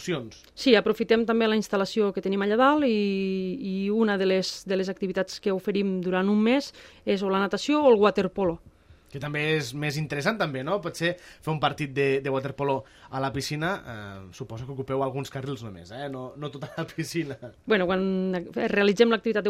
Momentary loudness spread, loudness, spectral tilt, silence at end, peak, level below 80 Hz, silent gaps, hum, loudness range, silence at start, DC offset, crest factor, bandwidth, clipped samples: 15 LU; -26 LUFS; -5.5 dB/octave; 0 s; -6 dBFS; -58 dBFS; none; none; 8 LU; 0 s; under 0.1%; 20 dB; 15.5 kHz; under 0.1%